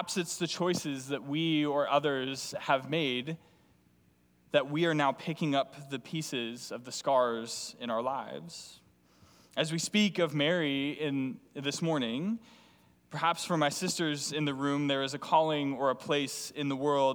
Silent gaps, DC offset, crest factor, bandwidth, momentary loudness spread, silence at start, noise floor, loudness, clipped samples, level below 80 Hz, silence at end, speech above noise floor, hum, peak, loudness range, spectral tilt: none; under 0.1%; 20 dB; over 20 kHz; 10 LU; 0 s; -67 dBFS; -31 LUFS; under 0.1%; -76 dBFS; 0 s; 35 dB; none; -12 dBFS; 3 LU; -4.5 dB/octave